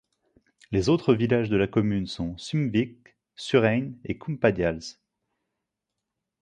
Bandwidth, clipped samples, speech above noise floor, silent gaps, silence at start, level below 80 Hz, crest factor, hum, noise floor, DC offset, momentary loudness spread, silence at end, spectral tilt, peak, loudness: 10 kHz; under 0.1%; 60 dB; none; 0.7 s; -50 dBFS; 20 dB; none; -84 dBFS; under 0.1%; 12 LU; 1.5 s; -7 dB/octave; -6 dBFS; -25 LUFS